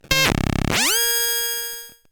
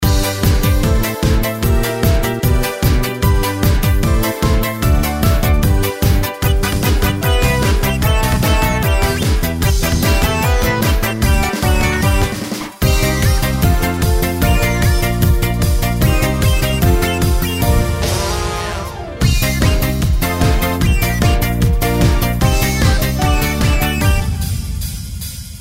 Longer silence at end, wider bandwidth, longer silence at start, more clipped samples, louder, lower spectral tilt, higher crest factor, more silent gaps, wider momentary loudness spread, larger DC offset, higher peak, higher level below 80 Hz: first, 0.2 s vs 0 s; first, 19.5 kHz vs 16.5 kHz; about the same, 0.1 s vs 0 s; neither; second, -18 LUFS vs -15 LUFS; second, -2 dB/octave vs -5 dB/octave; first, 20 dB vs 12 dB; neither; first, 10 LU vs 3 LU; neither; about the same, 0 dBFS vs 0 dBFS; second, -34 dBFS vs -18 dBFS